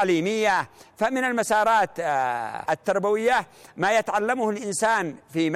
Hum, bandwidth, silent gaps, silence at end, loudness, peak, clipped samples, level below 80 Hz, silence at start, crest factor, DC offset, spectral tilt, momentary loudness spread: none; 15.5 kHz; none; 0 s; -24 LUFS; -12 dBFS; under 0.1%; -62 dBFS; 0 s; 12 dB; under 0.1%; -4 dB/octave; 6 LU